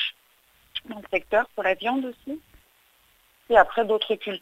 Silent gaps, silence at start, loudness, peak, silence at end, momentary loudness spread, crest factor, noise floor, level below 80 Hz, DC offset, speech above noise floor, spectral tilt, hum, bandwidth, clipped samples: none; 0 s; -24 LUFS; -4 dBFS; 0.05 s; 17 LU; 22 dB; -61 dBFS; -56 dBFS; under 0.1%; 38 dB; -4.5 dB/octave; none; 15.5 kHz; under 0.1%